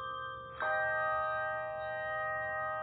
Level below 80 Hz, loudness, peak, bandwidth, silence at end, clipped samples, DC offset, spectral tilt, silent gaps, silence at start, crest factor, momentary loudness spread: -64 dBFS; -35 LUFS; -22 dBFS; 4.5 kHz; 0 s; under 0.1%; under 0.1%; -1 dB/octave; none; 0 s; 14 dB; 8 LU